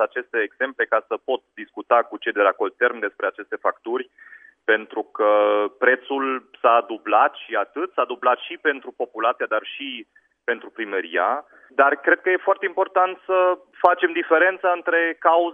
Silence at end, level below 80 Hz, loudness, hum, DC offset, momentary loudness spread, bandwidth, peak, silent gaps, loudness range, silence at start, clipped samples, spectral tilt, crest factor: 0 s; -80 dBFS; -21 LUFS; none; under 0.1%; 10 LU; 3.7 kHz; 0 dBFS; none; 5 LU; 0 s; under 0.1%; -5.5 dB/octave; 22 dB